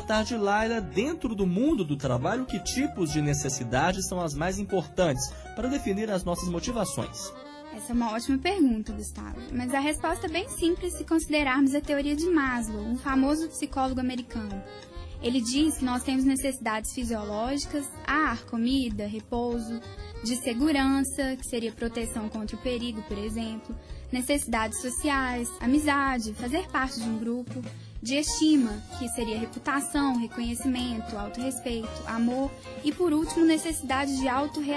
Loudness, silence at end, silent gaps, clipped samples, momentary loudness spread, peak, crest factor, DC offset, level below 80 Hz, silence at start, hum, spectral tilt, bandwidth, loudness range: -28 LUFS; 0 s; none; under 0.1%; 10 LU; -12 dBFS; 16 dB; under 0.1%; -44 dBFS; 0 s; none; -4.5 dB/octave; 11 kHz; 3 LU